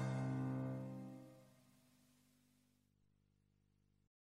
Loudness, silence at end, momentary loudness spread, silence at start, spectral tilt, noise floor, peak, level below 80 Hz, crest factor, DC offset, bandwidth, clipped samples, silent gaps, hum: -45 LUFS; 2.85 s; 20 LU; 0 s; -8 dB/octave; -79 dBFS; -34 dBFS; -80 dBFS; 16 dB; under 0.1%; 11 kHz; under 0.1%; none; 50 Hz at -80 dBFS